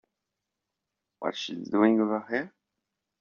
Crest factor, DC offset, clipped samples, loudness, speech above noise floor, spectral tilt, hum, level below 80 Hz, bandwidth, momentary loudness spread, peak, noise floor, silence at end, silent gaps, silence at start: 22 dB; under 0.1%; under 0.1%; -28 LUFS; 59 dB; -4 dB/octave; none; -76 dBFS; 7.2 kHz; 12 LU; -10 dBFS; -86 dBFS; 0.7 s; none; 1.2 s